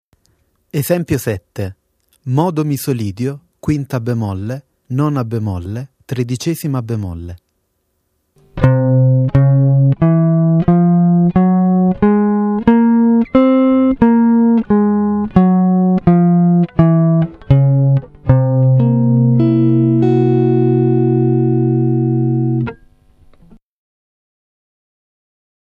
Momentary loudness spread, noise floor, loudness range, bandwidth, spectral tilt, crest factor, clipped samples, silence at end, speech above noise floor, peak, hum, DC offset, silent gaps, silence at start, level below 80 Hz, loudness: 12 LU; -66 dBFS; 9 LU; 15 kHz; -9 dB/octave; 14 dB; under 0.1%; 3.05 s; 48 dB; 0 dBFS; none; under 0.1%; none; 0.75 s; -38 dBFS; -13 LUFS